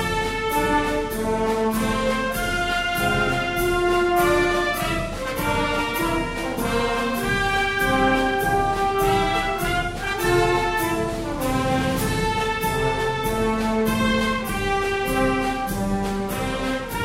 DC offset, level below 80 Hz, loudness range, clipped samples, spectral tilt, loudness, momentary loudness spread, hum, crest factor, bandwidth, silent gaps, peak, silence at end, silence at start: under 0.1%; -34 dBFS; 2 LU; under 0.1%; -4.5 dB/octave; -22 LUFS; 5 LU; none; 14 dB; 16 kHz; none; -8 dBFS; 0 s; 0 s